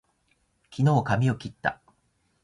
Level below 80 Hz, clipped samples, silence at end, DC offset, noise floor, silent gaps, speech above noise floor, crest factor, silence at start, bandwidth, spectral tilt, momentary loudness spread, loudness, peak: -56 dBFS; under 0.1%; 0.7 s; under 0.1%; -70 dBFS; none; 46 dB; 20 dB; 0.7 s; 11 kHz; -7.5 dB/octave; 16 LU; -26 LUFS; -8 dBFS